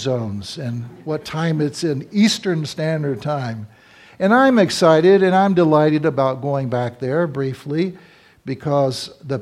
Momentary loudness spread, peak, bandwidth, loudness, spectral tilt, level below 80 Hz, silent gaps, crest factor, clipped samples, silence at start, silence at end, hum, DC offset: 14 LU; 0 dBFS; 14.5 kHz; -18 LUFS; -6 dB/octave; -60 dBFS; none; 18 dB; under 0.1%; 0 s; 0 s; none; under 0.1%